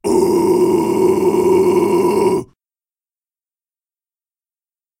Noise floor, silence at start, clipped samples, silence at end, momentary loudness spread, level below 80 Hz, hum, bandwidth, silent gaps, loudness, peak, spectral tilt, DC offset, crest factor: under -90 dBFS; 0.05 s; under 0.1%; 2.55 s; 3 LU; -52 dBFS; none; 16 kHz; none; -14 LUFS; -4 dBFS; -6.5 dB/octave; under 0.1%; 14 dB